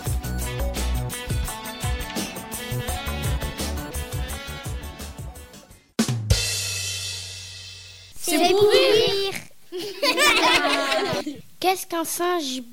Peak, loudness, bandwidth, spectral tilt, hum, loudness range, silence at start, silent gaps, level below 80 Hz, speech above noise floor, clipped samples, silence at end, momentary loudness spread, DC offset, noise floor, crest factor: -4 dBFS; -23 LUFS; 16.5 kHz; -3.5 dB/octave; none; 10 LU; 0 s; none; -34 dBFS; 27 dB; under 0.1%; 0 s; 19 LU; under 0.1%; -48 dBFS; 20 dB